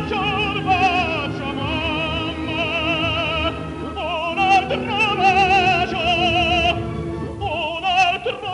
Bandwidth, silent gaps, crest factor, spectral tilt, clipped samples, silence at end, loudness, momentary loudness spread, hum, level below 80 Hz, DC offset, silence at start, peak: 10.5 kHz; none; 14 dB; -5 dB/octave; under 0.1%; 0 s; -19 LUFS; 10 LU; none; -38 dBFS; under 0.1%; 0 s; -6 dBFS